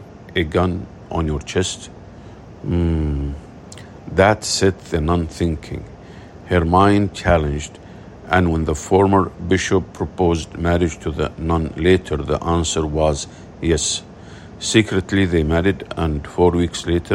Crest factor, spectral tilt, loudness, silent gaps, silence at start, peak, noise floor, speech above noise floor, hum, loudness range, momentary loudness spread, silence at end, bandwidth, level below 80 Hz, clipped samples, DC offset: 18 dB; -5.5 dB/octave; -19 LUFS; none; 0 s; 0 dBFS; -38 dBFS; 20 dB; none; 4 LU; 22 LU; 0 s; 12 kHz; -34 dBFS; under 0.1%; under 0.1%